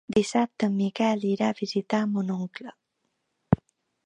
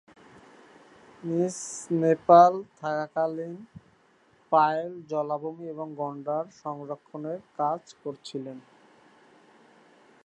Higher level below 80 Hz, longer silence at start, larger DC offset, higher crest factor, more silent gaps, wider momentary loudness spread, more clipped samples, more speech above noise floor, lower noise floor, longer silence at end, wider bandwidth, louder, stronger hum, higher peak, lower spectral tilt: first, -56 dBFS vs -76 dBFS; second, 0.1 s vs 1.25 s; neither; about the same, 22 dB vs 24 dB; neither; second, 8 LU vs 19 LU; neither; first, 52 dB vs 36 dB; first, -77 dBFS vs -62 dBFS; second, 0.5 s vs 1.65 s; about the same, 10.5 kHz vs 11 kHz; about the same, -27 LUFS vs -27 LUFS; neither; about the same, -4 dBFS vs -4 dBFS; about the same, -6.5 dB/octave vs -6 dB/octave